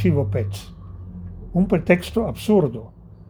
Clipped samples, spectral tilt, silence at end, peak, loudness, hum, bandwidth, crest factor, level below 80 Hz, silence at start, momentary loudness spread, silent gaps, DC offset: under 0.1%; -7.5 dB/octave; 0.05 s; -2 dBFS; -21 LUFS; none; over 20 kHz; 20 dB; -40 dBFS; 0 s; 18 LU; none; under 0.1%